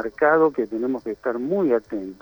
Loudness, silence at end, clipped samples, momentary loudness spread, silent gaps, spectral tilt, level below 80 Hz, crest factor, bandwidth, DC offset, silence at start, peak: -22 LUFS; 0.1 s; under 0.1%; 9 LU; none; -8.5 dB/octave; -58 dBFS; 16 dB; over 20 kHz; under 0.1%; 0 s; -6 dBFS